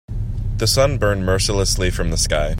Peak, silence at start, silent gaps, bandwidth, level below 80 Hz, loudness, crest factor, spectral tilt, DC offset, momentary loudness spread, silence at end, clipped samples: -4 dBFS; 0.1 s; none; 16 kHz; -24 dBFS; -19 LUFS; 14 dB; -4 dB/octave; under 0.1%; 9 LU; 0 s; under 0.1%